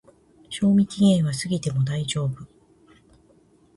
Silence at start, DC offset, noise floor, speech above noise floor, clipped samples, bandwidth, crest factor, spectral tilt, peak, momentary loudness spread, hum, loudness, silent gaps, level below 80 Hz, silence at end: 0.5 s; under 0.1%; -58 dBFS; 36 dB; under 0.1%; 11.5 kHz; 16 dB; -6 dB/octave; -8 dBFS; 11 LU; none; -22 LUFS; none; -56 dBFS; 1.3 s